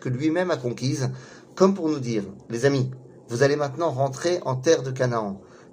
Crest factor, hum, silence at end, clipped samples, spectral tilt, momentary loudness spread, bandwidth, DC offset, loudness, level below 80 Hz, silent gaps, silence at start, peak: 20 dB; none; 0.1 s; under 0.1%; -6 dB/octave; 12 LU; 15 kHz; under 0.1%; -24 LUFS; -62 dBFS; none; 0 s; -4 dBFS